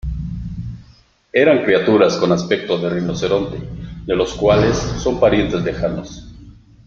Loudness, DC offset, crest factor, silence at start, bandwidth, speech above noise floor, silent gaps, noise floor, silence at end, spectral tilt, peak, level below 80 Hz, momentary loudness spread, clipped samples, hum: -17 LUFS; under 0.1%; 18 dB; 0.05 s; 7.6 kHz; 34 dB; none; -50 dBFS; 0.35 s; -6 dB/octave; 0 dBFS; -34 dBFS; 17 LU; under 0.1%; none